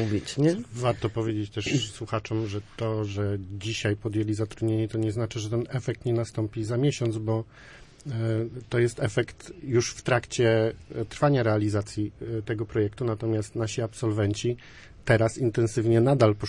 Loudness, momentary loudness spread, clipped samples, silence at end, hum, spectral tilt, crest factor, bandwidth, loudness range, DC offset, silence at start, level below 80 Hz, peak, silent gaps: -27 LUFS; 9 LU; under 0.1%; 0 s; none; -6 dB/octave; 20 dB; 11 kHz; 3 LU; under 0.1%; 0 s; -54 dBFS; -6 dBFS; none